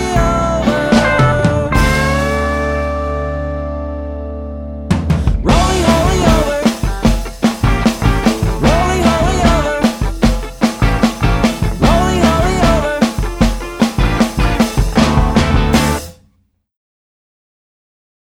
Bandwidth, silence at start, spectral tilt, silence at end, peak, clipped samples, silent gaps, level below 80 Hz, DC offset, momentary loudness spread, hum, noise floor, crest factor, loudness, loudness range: 17 kHz; 0 s; -5.5 dB/octave; 2.2 s; 0 dBFS; under 0.1%; none; -20 dBFS; under 0.1%; 8 LU; none; -58 dBFS; 14 dB; -14 LUFS; 3 LU